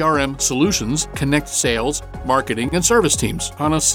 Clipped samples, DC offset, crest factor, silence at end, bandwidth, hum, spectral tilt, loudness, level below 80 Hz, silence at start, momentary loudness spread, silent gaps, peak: under 0.1%; under 0.1%; 16 dB; 0 s; 18.5 kHz; none; -3.5 dB/octave; -18 LUFS; -36 dBFS; 0 s; 6 LU; none; -2 dBFS